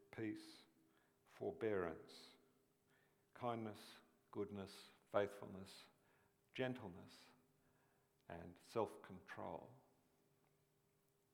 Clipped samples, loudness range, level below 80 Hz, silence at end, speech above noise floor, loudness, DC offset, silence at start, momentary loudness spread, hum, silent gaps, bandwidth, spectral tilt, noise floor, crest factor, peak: under 0.1%; 4 LU; -84 dBFS; 1.55 s; 33 dB; -49 LUFS; under 0.1%; 0 s; 21 LU; none; none; 19.5 kHz; -6 dB/octave; -81 dBFS; 26 dB; -26 dBFS